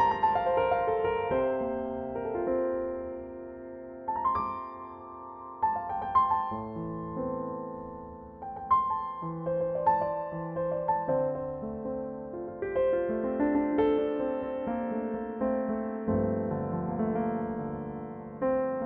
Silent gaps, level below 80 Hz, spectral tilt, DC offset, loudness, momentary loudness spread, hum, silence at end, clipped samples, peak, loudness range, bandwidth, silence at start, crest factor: none; -56 dBFS; -6.5 dB/octave; under 0.1%; -31 LUFS; 14 LU; none; 0 s; under 0.1%; -14 dBFS; 3 LU; 5.2 kHz; 0 s; 16 dB